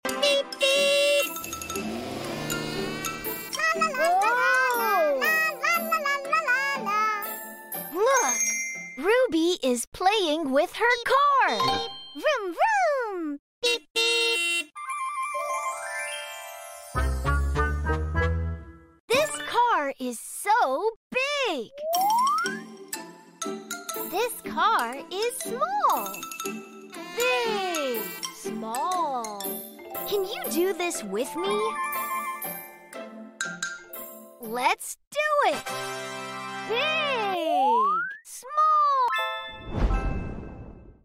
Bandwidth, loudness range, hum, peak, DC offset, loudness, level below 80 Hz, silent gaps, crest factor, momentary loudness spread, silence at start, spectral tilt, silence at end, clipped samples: 16 kHz; 6 LU; none; -8 dBFS; under 0.1%; -26 LUFS; -40 dBFS; 9.87-9.92 s, 13.39-13.62 s, 13.90-13.95 s, 19.00-19.08 s, 20.96-21.10 s, 35.07-35.11 s; 18 dB; 13 LU; 0.05 s; -3 dB/octave; 0.15 s; under 0.1%